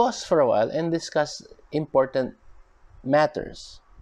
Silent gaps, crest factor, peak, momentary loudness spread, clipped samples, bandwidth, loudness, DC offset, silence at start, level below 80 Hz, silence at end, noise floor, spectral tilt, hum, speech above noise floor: none; 18 dB; -8 dBFS; 17 LU; under 0.1%; 10 kHz; -24 LUFS; under 0.1%; 0 s; -54 dBFS; 0.25 s; -50 dBFS; -5.5 dB/octave; none; 27 dB